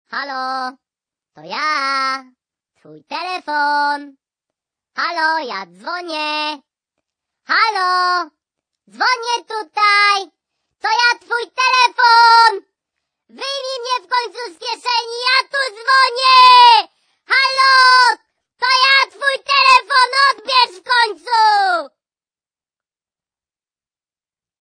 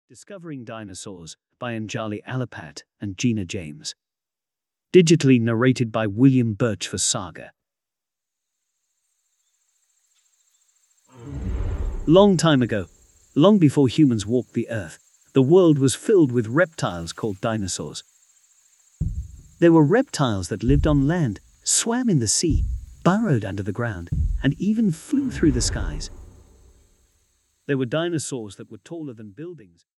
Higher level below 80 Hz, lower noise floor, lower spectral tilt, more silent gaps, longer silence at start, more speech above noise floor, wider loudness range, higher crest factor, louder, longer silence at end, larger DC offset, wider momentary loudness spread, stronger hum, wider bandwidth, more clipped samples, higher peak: second, -72 dBFS vs -36 dBFS; about the same, under -90 dBFS vs -89 dBFS; second, 0.5 dB/octave vs -5.5 dB/octave; neither; about the same, 0.1 s vs 0.2 s; first, over 75 dB vs 69 dB; about the same, 11 LU vs 11 LU; about the same, 16 dB vs 20 dB; first, -14 LUFS vs -21 LUFS; first, 2.75 s vs 0.4 s; neither; second, 17 LU vs 21 LU; neither; second, 10 kHz vs 12 kHz; neither; about the same, 0 dBFS vs -2 dBFS